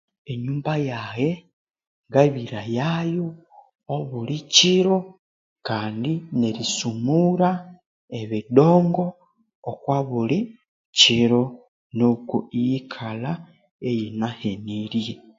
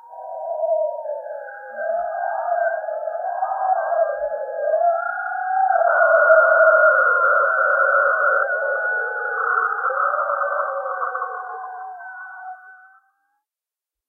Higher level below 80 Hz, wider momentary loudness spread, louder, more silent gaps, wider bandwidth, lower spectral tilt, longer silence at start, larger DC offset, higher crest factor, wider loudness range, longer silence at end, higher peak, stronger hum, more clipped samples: first, -62 dBFS vs -74 dBFS; second, 16 LU vs 19 LU; second, -22 LUFS vs -19 LUFS; first, 1.53-1.67 s, 1.87-2.04 s, 5.19-5.56 s, 7.86-8.08 s, 9.55-9.63 s, 10.68-10.93 s, 11.68-11.90 s, 13.71-13.79 s vs none; first, 7.8 kHz vs 3.1 kHz; first, -5 dB/octave vs -3.5 dB/octave; first, 0.3 s vs 0.05 s; neither; about the same, 22 dB vs 18 dB; second, 5 LU vs 10 LU; second, 0.2 s vs 1.3 s; about the same, 0 dBFS vs -2 dBFS; neither; neither